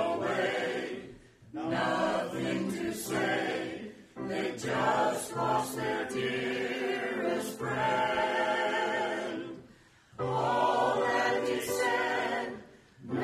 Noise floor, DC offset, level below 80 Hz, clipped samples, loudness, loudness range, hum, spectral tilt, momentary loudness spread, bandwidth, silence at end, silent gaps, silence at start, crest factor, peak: -58 dBFS; under 0.1%; -66 dBFS; under 0.1%; -31 LUFS; 2 LU; none; -4.5 dB/octave; 12 LU; 15.5 kHz; 0 s; none; 0 s; 16 dB; -14 dBFS